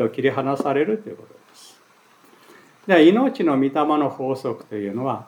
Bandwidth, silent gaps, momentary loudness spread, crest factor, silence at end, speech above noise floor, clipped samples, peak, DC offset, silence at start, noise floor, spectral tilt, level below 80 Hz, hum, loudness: 11.5 kHz; none; 14 LU; 18 dB; 0.05 s; 35 dB; under 0.1%; -2 dBFS; under 0.1%; 0 s; -54 dBFS; -7 dB/octave; -82 dBFS; none; -20 LUFS